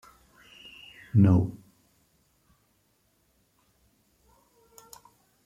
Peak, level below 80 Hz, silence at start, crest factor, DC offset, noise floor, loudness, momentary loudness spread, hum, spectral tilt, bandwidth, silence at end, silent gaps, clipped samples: -10 dBFS; -60 dBFS; 1.15 s; 22 dB; under 0.1%; -70 dBFS; -24 LUFS; 30 LU; none; -8.5 dB/octave; 14 kHz; 3.9 s; none; under 0.1%